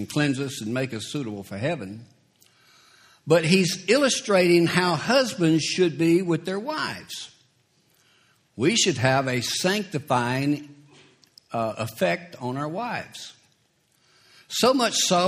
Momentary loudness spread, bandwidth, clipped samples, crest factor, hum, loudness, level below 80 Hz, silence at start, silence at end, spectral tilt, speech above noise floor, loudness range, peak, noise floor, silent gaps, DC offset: 14 LU; 15 kHz; under 0.1%; 22 dB; none; -23 LUFS; -64 dBFS; 0 s; 0 s; -4 dB/octave; 43 dB; 9 LU; -2 dBFS; -66 dBFS; none; under 0.1%